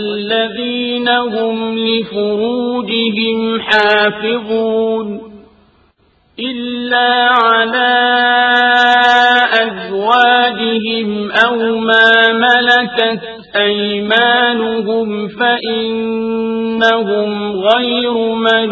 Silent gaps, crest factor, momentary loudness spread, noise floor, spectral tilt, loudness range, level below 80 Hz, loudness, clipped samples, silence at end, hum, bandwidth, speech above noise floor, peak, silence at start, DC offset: none; 14 dB; 9 LU; -54 dBFS; -5 dB/octave; 5 LU; -54 dBFS; -12 LUFS; under 0.1%; 0 s; none; 8 kHz; 41 dB; 0 dBFS; 0 s; under 0.1%